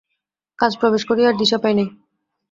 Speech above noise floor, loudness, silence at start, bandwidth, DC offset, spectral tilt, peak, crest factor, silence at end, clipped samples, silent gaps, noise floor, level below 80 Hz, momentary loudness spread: 60 dB; -18 LUFS; 0.6 s; 7.6 kHz; under 0.1%; -5 dB/octave; -2 dBFS; 18 dB; 0.6 s; under 0.1%; none; -78 dBFS; -60 dBFS; 6 LU